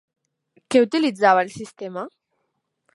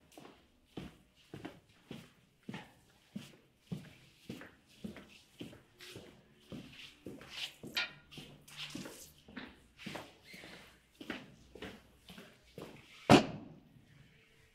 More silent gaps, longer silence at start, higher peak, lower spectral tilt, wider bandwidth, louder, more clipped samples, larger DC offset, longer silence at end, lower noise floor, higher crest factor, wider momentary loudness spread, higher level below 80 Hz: neither; first, 0.7 s vs 0.15 s; first, -2 dBFS vs -8 dBFS; about the same, -4.5 dB/octave vs -5 dB/octave; second, 11.5 kHz vs 16 kHz; first, -19 LUFS vs -38 LUFS; neither; neither; about the same, 0.85 s vs 0.95 s; first, -75 dBFS vs -65 dBFS; second, 20 dB vs 32 dB; about the same, 17 LU vs 18 LU; about the same, -70 dBFS vs -68 dBFS